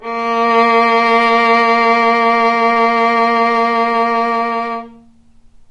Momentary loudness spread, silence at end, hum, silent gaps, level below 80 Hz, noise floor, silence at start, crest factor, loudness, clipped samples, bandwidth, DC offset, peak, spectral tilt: 6 LU; 0.8 s; none; none; -54 dBFS; -45 dBFS; 0 s; 12 dB; -12 LUFS; under 0.1%; 10.5 kHz; under 0.1%; -2 dBFS; -4 dB/octave